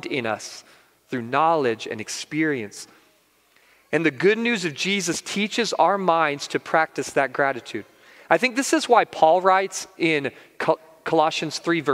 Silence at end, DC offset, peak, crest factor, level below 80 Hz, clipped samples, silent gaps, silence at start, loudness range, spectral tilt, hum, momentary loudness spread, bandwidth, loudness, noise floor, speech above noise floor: 0 s; under 0.1%; -2 dBFS; 22 dB; -72 dBFS; under 0.1%; none; 0.05 s; 5 LU; -3.5 dB/octave; none; 12 LU; 16 kHz; -22 LUFS; -61 dBFS; 39 dB